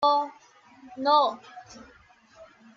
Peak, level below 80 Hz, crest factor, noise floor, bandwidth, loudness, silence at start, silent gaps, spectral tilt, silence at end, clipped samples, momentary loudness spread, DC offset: -10 dBFS; -70 dBFS; 20 dB; -55 dBFS; 7.4 kHz; -25 LUFS; 0 s; none; -3.5 dB/octave; 0.3 s; under 0.1%; 25 LU; under 0.1%